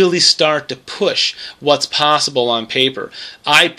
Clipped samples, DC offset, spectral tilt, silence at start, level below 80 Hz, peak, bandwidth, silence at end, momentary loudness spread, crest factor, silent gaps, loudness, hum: under 0.1%; under 0.1%; -2 dB/octave; 0 s; -62 dBFS; 0 dBFS; 16 kHz; 0.05 s; 13 LU; 16 dB; none; -14 LUFS; none